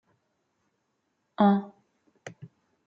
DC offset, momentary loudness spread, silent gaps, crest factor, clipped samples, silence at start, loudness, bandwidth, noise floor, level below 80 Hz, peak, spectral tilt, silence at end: under 0.1%; 24 LU; none; 24 dB; under 0.1%; 1.4 s; -25 LUFS; 7.2 kHz; -77 dBFS; -78 dBFS; -8 dBFS; -8 dB/octave; 0.6 s